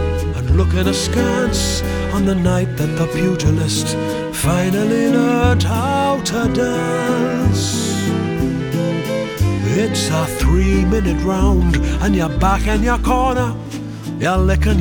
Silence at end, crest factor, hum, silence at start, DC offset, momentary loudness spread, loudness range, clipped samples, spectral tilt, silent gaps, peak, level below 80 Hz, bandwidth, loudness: 0 s; 14 dB; none; 0 s; under 0.1%; 5 LU; 2 LU; under 0.1%; -5.5 dB/octave; none; -2 dBFS; -24 dBFS; 20 kHz; -17 LUFS